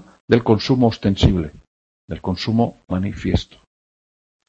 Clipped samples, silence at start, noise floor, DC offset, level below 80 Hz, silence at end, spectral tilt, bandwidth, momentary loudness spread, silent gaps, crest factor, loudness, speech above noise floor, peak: under 0.1%; 0.3 s; under -90 dBFS; under 0.1%; -34 dBFS; 1.05 s; -7.5 dB/octave; 7.8 kHz; 12 LU; 1.67-2.08 s; 20 dB; -19 LUFS; over 72 dB; 0 dBFS